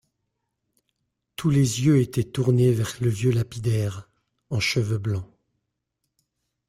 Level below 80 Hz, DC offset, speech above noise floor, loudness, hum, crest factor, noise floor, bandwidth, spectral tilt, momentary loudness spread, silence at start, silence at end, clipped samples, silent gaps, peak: -54 dBFS; under 0.1%; 57 dB; -23 LUFS; none; 18 dB; -79 dBFS; 15.5 kHz; -6 dB/octave; 11 LU; 1.4 s; 1.45 s; under 0.1%; none; -8 dBFS